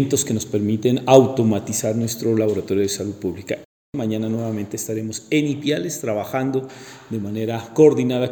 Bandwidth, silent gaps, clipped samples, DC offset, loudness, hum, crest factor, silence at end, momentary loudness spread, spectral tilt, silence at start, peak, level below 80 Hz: 19.5 kHz; 3.65-3.93 s; under 0.1%; under 0.1%; -21 LUFS; none; 20 dB; 0 s; 14 LU; -5.5 dB/octave; 0 s; 0 dBFS; -62 dBFS